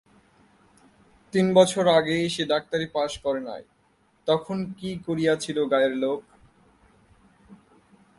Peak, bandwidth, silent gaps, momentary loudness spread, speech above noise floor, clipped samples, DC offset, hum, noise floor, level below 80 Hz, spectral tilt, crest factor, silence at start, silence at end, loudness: -4 dBFS; 11.5 kHz; none; 14 LU; 41 dB; under 0.1%; under 0.1%; none; -64 dBFS; -60 dBFS; -5 dB/octave; 22 dB; 1.35 s; 0.65 s; -24 LUFS